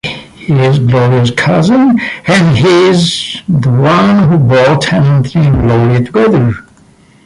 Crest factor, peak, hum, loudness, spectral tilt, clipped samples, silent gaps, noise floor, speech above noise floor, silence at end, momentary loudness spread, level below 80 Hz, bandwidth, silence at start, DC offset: 8 dB; 0 dBFS; none; -9 LUFS; -6.5 dB/octave; under 0.1%; none; -43 dBFS; 35 dB; 0.65 s; 6 LU; -32 dBFS; 11.5 kHz; 0.05 s; under 0.1%